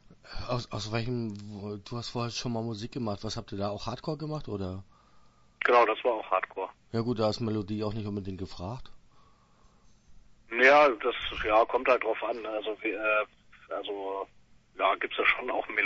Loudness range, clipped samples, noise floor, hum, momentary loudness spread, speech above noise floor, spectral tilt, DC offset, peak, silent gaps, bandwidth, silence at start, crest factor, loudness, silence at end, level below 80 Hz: 9 LU; under 0.1%; -61 dBFS; none; 16 LU; 32 dB; -5.5 dB/octave; under 0.1%; -8 dBFS; none; 8 kHz; 0.1 s; 22 dB; -29 LUFS; 0 s; -54 dBFS